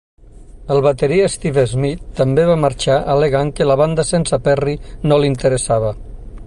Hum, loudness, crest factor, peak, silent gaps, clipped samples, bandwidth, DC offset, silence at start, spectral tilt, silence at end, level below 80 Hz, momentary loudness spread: none; -16 LUFS; 14 dB; -2 dBFS; none; under 0.1%; 11.5 kHz; under 0.1%; 0.4 s; -6 dB/octave; 0 s; -34 dBFS; 7 LU